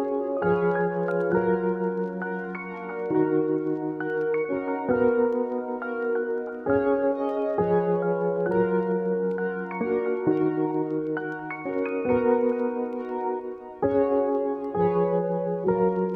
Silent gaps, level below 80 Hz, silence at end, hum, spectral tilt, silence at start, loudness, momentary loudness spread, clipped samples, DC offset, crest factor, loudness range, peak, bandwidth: none; -58 dBFS; 0 s; none; -10.5 dB/octave; 0 s; -26 LUFS; 7 LU; under 0.1%; under 0.1%; 16 dB; 2 LU; -10 dBFS; 4.4 kHz